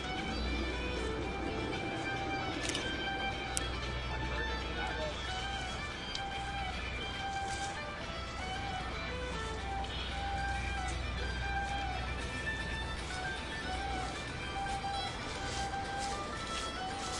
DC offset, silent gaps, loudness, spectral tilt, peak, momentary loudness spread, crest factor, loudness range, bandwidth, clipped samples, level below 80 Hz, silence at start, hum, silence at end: under 0.1%; none; -37 LUFS; -4 dB/octave; -10 dBFS; 3 LU; 28 dB; 2 LU; 11.5 kHz; under 0.1%; -44 dBFS; 0 s; none; 0 s